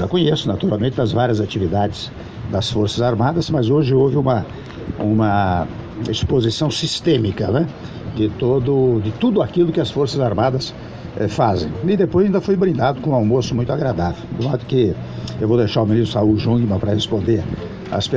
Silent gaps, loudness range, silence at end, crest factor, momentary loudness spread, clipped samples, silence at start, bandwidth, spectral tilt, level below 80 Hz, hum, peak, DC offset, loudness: none; 1 LU; 0 s; 14 dB; 9 LU; under 0.1%; 0 s; 9.2 kHz; -7 dB/octave; -40 dBFS; none; -2 dBFS; under 0.1%; -18 LUFS